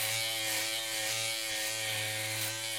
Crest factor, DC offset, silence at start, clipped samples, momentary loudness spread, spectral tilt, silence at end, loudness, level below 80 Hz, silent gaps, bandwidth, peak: 16 dB; under 0.1%; 0 s; under 0.1%; 2 LU; -0.5 dB/octave; 0 s; -31 LUFS; -72 dBFS; none; 16.5 kHz; -18 dBFS